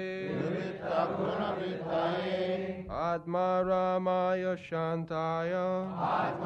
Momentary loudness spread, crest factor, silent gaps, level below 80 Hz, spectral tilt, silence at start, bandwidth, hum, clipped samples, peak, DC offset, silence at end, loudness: 6 LU; 14 dB; none; -60 dBFS; -7.5 dB/octave; 0 s; 7.8 kHz; none; under 0.1%; -18 dBFS; under 0.1%; 0 s; -32 LUFS